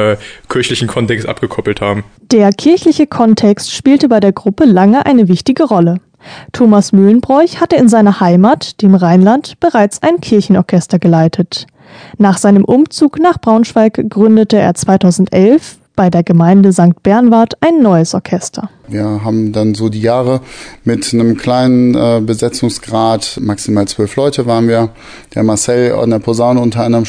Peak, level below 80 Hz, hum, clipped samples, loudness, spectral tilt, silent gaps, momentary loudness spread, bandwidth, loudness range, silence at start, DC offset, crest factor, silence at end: 0 dBFS; -44 dBFS; none; 2%; -10 LUFS; -6.5 dB/octave; none; 9 LU; 10 kHz; 4 LU; 0 s; under 0.1%; 10 dB; 0 s